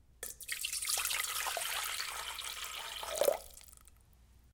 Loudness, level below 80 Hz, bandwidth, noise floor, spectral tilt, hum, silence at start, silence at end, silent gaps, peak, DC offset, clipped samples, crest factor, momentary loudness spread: -36 LUFS; -64 dBFS; 19 kHz; -63 dBFS; 1 dB/octave; none; 0.2 s; 0.05 s; none; -14 dBFS; under 0.1%; under 0.1%; 26 dB; 12 LU